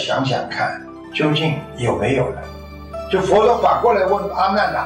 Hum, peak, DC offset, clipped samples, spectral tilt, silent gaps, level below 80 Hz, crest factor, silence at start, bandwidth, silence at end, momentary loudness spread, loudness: none; -4 dBFS; under 0.1%; under 0.1%; -6 dB/octave; none; -42 dBFS; 14 dB; 0 s; 15.5 kHz; 0 s; 17 LU; -18 LUFS